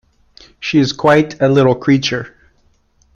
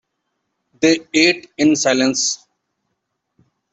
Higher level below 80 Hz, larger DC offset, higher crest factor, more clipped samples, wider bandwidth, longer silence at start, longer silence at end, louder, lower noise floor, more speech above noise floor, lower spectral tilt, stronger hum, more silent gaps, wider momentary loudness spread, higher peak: first, -50 dBFS vs -62 dBFS; neither; about the same, 16 dB vs 18 dB; neither; second, 7.4 kHz vs 8.4 kHz; second, 0.6 s vs 0.8 s; second, 0.85 s vs 1.35 s; about the same, -14 LUFS vs -16 LUFS; second, -56 dBFS vs -74 dBFS; second, 43 dB vs 58 dB; first, -6 dB/octave vs -2.5 dB/octave; neither; neither; first, 12 LU vs 5 LU; about the same, 0 dBFS vs -2 dBFS